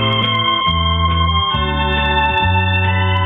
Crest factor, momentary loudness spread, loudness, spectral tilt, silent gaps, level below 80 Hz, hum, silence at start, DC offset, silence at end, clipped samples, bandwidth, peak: 12 dB; 2 LU; -15 LUFS; -7.5 dB/octave; none; -26 dBFS; none; 0 s; under 0.1%; 0 s; under 0.1%; 3.9 kHz; -4 dBFS